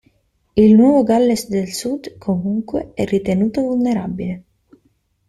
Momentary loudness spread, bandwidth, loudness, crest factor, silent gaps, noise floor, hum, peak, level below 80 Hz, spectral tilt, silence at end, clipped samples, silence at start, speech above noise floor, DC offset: 14 LU; 14 kHz; -17 LUFS; 14 dB; none; -62 dBFS; none; -2 dBFS; -48 dBFS; -6.5 dB/octave; 0.9 s; under 0.1%; 0.55 s; 46 dB; under 0.1%